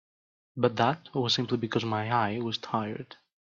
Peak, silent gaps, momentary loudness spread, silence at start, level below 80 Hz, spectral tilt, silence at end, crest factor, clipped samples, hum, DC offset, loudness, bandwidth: -10 dBFS; none; 12 LU; 0.55 s; -70 dBFS; -5.5 dB/octave; 0.45 s; 20 dB; under 0.1%; none; under 0.1%; -29 LUFS; 7.6 kHz